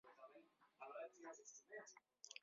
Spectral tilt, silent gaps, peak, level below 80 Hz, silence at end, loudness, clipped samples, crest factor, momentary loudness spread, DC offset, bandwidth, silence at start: 0 dB/octave; none; -38 dBFS; under -90 dBFS; 0 s; -59 LUFS; under 0.1%; 24 dB; 9 LU; under 0.1%; 7.4 kHz; 0.05 s